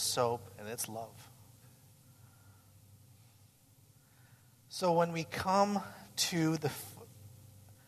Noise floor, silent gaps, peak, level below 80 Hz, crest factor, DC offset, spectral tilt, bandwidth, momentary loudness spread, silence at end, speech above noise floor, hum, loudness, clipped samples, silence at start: -64 dBFS; none; -16 dBFS; -72 dBFS; 22 dB; under 0.1%; -4 dB/octave; 14 kHz; 25 LU; 0.15 s; 30 dB; none; -34 LUFS; under 0.1%; 0 s